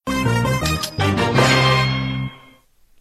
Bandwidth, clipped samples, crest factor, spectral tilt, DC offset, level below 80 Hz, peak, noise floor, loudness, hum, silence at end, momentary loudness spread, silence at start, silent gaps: 14.5 kHz; under 0.1%; 16 dB; -5 dB/octave; under 0.1%; -36 dBFS; -2 dBFS; -52 dBFS; -18 LUFS; none; 0.65 s; 11 LU; 0.05 s; none